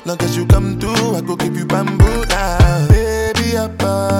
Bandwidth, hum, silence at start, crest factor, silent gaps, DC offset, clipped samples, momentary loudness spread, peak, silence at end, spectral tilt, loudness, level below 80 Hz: 17 kHz; none; 0.05 s; 14 dB; none; under 0.1%; under 0.1%; 6 LU; 0 dBFS; 0 s; -6 dB/octave; -15 LUFS; -20 dBFS